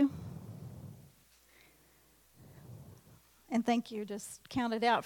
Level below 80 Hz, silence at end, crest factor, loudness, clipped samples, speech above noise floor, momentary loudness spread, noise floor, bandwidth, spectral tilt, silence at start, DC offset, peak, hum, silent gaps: -68 dBFS; 0 s; 22 dB; -36 LUFS; under 0.1%; 33 dB; 24 LU; -66 dBFS; 18 kHz; -5 dB/octave; 0 s; under 0.1%; -16 dBFS; none; none